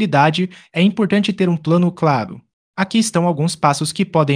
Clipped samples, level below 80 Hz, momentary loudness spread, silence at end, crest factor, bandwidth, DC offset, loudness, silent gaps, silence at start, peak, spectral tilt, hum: under 0.1%; -60 dBFS; 7 LU; 0 s; 16 dB; 10.5 kHz; under 0.1%; -17 LUFS; 2.53-2.74 s; 0 s; 0 dBFS; -5.5 dB/octave; none